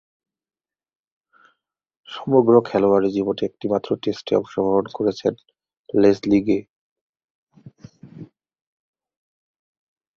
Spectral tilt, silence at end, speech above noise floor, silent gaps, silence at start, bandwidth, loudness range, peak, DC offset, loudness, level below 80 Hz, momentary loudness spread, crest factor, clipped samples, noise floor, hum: -7.5 dB/octave; 1.9 s; 54 dB; 5.77-5.84 s, 6.69-7.13 s, 7.24-7.47 s; 2.1 s; 7 kHz; 4 LU; -2 dBFS; under 0.1%; -20 LUFS; -60 dBFS; 9 LU; 20 dB; under 0.1%; -73 dBFS; none